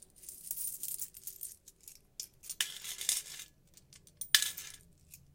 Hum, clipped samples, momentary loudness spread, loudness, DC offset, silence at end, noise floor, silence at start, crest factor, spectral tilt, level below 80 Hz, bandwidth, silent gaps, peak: none; under 0.1%; 24 LU; -35 LUFS; under 0.1%; 0.15 s; -62 dBFS; 0.15 s; 38 dB; 2.5 dB/octave; -70 dBFS; 17 kHz; none; -2 dBFS